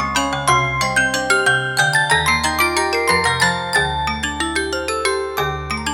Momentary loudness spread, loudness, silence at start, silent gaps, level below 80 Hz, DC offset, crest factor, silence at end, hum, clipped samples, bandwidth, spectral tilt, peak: 6 LU; -17 LUFS; 0 s; none; -36 dBFS; under 0.1%; 16 dB; 0 s; none; under 0.1%; 19 kHz; -3 dB/octave; -2 dBFS